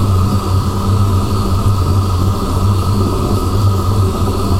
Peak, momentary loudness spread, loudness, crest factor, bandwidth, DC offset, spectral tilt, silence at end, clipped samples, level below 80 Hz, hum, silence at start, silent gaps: -2 dBFS; 2 LU; -15 LUFS; 12 dB; 15.5 kHz; under 0.1%; -7 dB/octave; 0 s; under 0.1%; -22 dBFS; none; 0 s; none